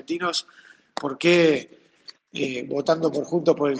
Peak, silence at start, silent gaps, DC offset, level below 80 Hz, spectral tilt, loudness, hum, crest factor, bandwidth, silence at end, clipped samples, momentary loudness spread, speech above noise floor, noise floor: -6 dBFS; 0.1 s; none; under 0.1%; -68 dBFS; -5 dB/octave; -23 LUFS; none; 18 dB; 9.6 kHz; 0 s; under 0.1%; 13 LU; 27 dB; -50 dBFS